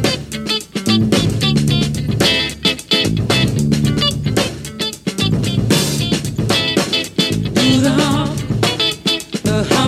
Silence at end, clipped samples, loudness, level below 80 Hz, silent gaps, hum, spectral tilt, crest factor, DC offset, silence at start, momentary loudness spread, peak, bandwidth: 0 s; under 0.1%; -16 LUFS; -36 dBFS; none; none; -4.5 dB/octave; 16 dB; under 0.1%; 0 s; 6 LU; 0 dBFS; 16 kHz